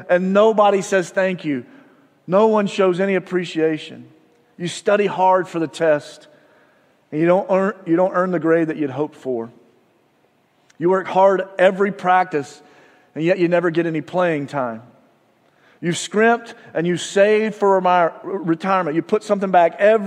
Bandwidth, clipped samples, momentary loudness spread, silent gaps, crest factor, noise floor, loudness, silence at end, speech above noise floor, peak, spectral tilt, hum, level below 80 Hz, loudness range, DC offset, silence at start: 11 kHz; under 0.1%; 11 LU; none; 18 dB; -60 dBFS; -18 LUFS; 0 s; 42 dB; 0 dBFS; -5.5 dB/octave; none; -76 dBFS; 4 LU; under 0.1%; 0 s